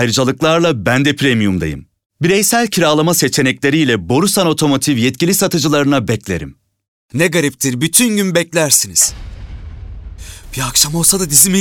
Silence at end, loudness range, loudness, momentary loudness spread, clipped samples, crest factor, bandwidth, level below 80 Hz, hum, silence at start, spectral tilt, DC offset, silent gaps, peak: 0 s; 2 LU; -13 LUFS; 22 LU; under 0.1%; 14 dB; 19.5 kHz; -38 dBFS; none; 0 s; -3.5 dB/octave; under 0.1%; 2.06-2.10 s, 6.88-7.09 s; 0 dBFS